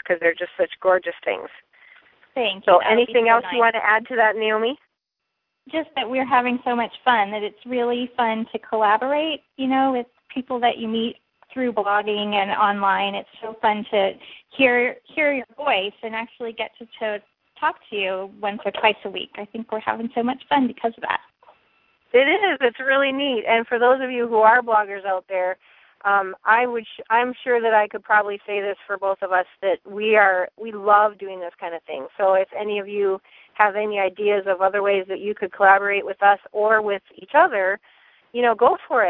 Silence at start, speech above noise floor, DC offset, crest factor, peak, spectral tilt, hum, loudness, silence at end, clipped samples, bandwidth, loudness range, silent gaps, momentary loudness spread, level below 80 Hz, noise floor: 0.05 s; 59 dB; under 0.1%; 20 dB; 0 dBFS; -7.5 dB/octave; none; -21 LUFS; 0 s; under 0.1%; 4.3 kHz; 5 LU; none; 13 LU; -68 dBFS; -80 dBFS